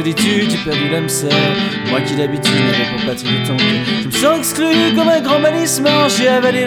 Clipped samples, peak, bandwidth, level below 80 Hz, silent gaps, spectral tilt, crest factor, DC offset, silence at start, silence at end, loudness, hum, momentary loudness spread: under 0.1%; 0 dBFS; over 20 kHz; -50 dBFS; none; -4 dB/octave; 14 dB; under 0.1%; 0 s; 0 s; -14 LUFS; none; 5 LU